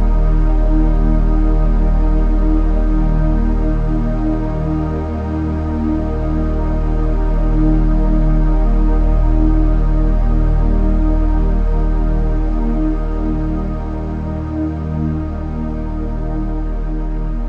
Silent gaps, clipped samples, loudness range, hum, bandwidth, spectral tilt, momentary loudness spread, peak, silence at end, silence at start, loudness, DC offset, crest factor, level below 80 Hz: none; under 0.1%; 5 LU; none; 3 kHz; -10 dB/octave; 6 LU; -2 dBFS; 0 s; 0 s; -18 LUFS; under 0.1%; 12 dB; -14 dBFS